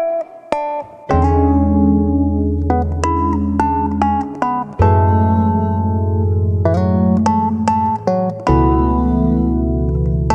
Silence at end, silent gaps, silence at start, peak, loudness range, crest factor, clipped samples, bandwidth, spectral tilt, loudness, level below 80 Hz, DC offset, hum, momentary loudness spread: 0 s; none; 0 s; 0 dBFS; 1 LU; 14 dB; under 0.1%; 8.6 kHz; -9 dB/octave; -16 LUFS; -24 dBFS; under 0.1%; none; 6 LU